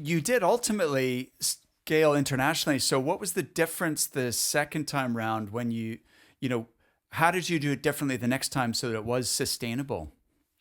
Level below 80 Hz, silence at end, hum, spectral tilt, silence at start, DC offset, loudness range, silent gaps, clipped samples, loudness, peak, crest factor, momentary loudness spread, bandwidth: -62 dBFS; 0.5 s; none; -4 dB/octave; 0 s; under 0.1%; 4 LU; none; under 0.1%; -28 LUFS; -6 dBFS; 22 dB; 9 LU; over 20 kHz